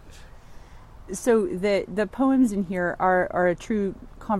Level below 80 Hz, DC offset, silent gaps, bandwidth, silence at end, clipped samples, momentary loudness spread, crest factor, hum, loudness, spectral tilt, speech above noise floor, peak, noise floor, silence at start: -46 dBFS; under 0.1%; none; 13.5 kHz; 0 s; under 0.1%; 7 LU; 16 dB; none; -24 LUFS; -6 dB/octave; 21 dB; -8 dBFS; -44 dBFS; 0.05 s